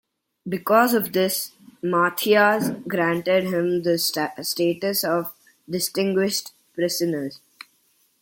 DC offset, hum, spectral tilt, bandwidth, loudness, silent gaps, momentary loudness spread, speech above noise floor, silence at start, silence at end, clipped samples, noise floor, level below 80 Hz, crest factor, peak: under 0.1%; none; -4 dB/octave; 17 kHz; -22 LUFS; none; 13 LU; 42 dB; 0.45 s; 0.85 s; under 0.1%; -64 dBFS; -68 dBFS; 20 dB; -4 dBFS